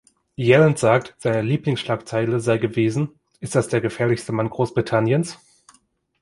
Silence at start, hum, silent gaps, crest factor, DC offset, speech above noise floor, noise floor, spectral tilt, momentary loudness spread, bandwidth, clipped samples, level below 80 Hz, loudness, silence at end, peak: 0.4 s; none; none; 20 dB; under 0.1%; 41 dB; -61 dBFS; -6.5 dB/octave; 9 LU; 11.5 kHz; under 0.1%; -56 dBFS; -21 LUFS; 0.85 s; -2 dBFS